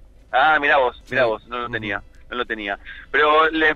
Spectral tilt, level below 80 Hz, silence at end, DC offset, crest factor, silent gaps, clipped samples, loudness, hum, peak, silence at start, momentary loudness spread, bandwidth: -5.5 dB/octave; -46 dBFS; 0 s; under 0.1%; 16 dB; none; under 0.1%; -20 LUFS; none; -4 dBFS; 0.3 s; 13 LU; 7.6 kHz